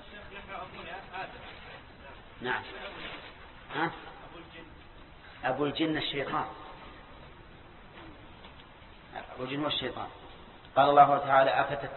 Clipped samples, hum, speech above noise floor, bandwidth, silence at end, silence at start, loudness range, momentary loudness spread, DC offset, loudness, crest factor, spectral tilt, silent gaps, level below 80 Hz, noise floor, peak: under 0.1%; none; 24 dB; 4.3 kHz; 0 s; 0 s; 13 LU; 27 LU; under 0.1%; -29 LUFS; 24 dB; -8.5 dB/octave; none; -58 dBFS; -52 dBFS; -8 dBFS